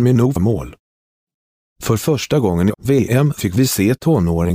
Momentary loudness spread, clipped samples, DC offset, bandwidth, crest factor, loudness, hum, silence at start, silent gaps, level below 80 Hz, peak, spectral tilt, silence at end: 6 LU; under 0.1%; under 0.1%; 15.5 kHz; 14 dB; -16 LUFS; none; 0 s; 0.79-1.27 s, 1.34-1.76 s; -38 dBFS; -4 dBFS; -6.5 dB/octave; 0 s